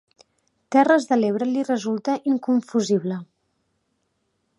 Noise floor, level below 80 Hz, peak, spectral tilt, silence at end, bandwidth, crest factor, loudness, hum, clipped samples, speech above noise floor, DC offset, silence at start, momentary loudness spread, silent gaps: -72 dBFS; -76 dBFS; -4 dBFS; -6 dB/octave; 1.35 s; 11 kHz; 20 dB; -21 LUFS; none; under 0.1%; 52 dB; under 0.1%; 0.7 s; 7 LU; none